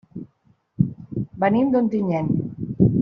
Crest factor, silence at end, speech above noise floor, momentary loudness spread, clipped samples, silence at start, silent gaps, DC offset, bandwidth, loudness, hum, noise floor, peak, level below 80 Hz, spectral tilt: 18 dB; 0 s; 42 dB; 12 LU; under 0.1%; 0.15 s; none; under 0.1%; 5.2 kHz; -22 LUFS; none; -61 dBFS; -4 dBFS; -48 dBFS; -9.5 dB/octave